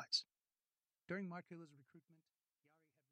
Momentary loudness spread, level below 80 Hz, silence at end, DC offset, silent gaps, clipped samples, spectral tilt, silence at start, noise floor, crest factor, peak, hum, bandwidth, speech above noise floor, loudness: 21 LU; under -90 dBFS; 1 s; under 0.1%; none; under 0.1%; -3.5 dB/octave; 0 s; under -90 dBFS; 26 dB; -26 dBFS; none; 9.6 kHz; over 38 dB; -46 LUFS